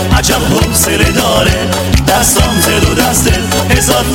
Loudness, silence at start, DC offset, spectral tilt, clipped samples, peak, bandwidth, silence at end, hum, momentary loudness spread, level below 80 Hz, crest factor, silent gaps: -9 LUFS; 0 s; under 0.1%; -3.5 dB/octave; 0.4%; 0 dBFS; 17 kHz; 0 s; none; 3 LU; -18 dBFS; 10 dB; none